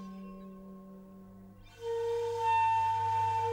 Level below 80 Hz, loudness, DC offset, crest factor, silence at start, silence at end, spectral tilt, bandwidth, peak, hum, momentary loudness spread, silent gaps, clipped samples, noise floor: -62 dBFS; -31 LUFS; under 0.1%; 10 dB; 0 s; 0 s; -5.5 dB/octave; 13.5 kHz; -22 dBFS; 50 Hz at -55 dBFS; 24 LU; none; under 0.1%; -53 dBFS